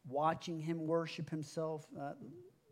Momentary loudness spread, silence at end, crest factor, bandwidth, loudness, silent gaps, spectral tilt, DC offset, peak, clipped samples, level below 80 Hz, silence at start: 15 LU; 0.25 s; 18 dB; 14 kHz; -40 LUFS; none; -6.5 dB/octave; under 0.1%; -22 dBFS; under 0.1%; -82 dBFS; 0.05 s